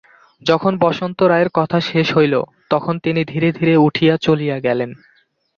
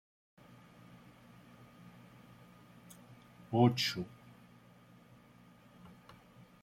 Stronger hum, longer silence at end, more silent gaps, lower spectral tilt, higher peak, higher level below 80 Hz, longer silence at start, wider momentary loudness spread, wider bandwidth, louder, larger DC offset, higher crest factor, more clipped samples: neither; second, 0.6 s vs 0.75 s; neither; first, -7.5 dB/octave vs -5.5 dB/octave; first, -2 dBFS vs -14 dBFS; first, -56 dBFS vs -74 dBFS; second, 0.45 s vs 3.1 s; second, 6 LU vs 29 LU; second, 7 kHz vs 16 kHz; first, -16 LUFS vs -33 LUFS; neither; second, 16 dB vs 28 dB; neither